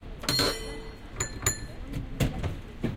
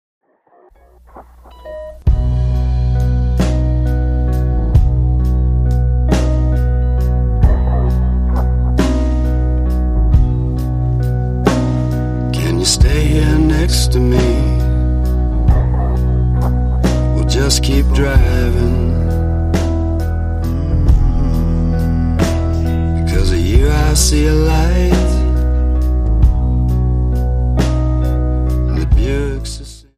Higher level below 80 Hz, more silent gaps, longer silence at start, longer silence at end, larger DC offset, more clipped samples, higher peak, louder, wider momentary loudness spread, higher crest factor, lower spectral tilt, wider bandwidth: second, -40 dBFS vs -14 dBFS; neither; second, 0 s vs 1.15 s; second, 0 s vs 0.2 s; neither; neither; second, -10 dBFS vs 0 dBFS; second, -30 LUFS vs -15 LUFS; first, 14 LU vs 4 LU; first, 22 dB vs 12 dB; second, -3.5 dB/octave vs -6 dB/octave; first, 16.5 kHz vs 14 kHz